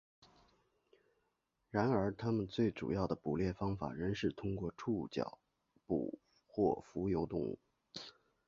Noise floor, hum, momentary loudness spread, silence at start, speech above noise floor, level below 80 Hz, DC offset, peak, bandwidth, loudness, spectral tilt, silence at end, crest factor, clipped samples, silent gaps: -83 dBFS; none; 14 LU; 1.75 s; 46 dB; -60 dBFS; under 0.1%; -18 dBFS; 7.4 kHz; -39 LUFS; -6.5 dB/octave; 0.35 s; 22 dB; under 0.1%; none